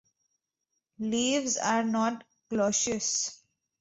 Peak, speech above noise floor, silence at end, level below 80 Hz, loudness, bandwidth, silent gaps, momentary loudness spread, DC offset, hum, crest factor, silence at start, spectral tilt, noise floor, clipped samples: -14 dBFS; 54 dB; 0.45 s; -68 dBFS; -28 LUFS; 8.4 kHz; none; 9 LU; under 0.1%; none; 18 dB; 1 s; -2.5 dB/octave; -83 dBFS; under 0.1%